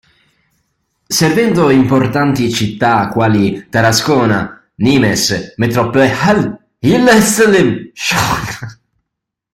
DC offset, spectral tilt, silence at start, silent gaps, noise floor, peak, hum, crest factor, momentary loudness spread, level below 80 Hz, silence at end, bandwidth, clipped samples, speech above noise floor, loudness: under 0.1%; -4.5 dB/octave; 1.1 s; none; -78 dBFS; 0 dBFS; none; 12 dB; 9 LU; -42 dBFS; 0.8 s; 16.5 kHz; under 0.1%; 66 dB; -12 LUFS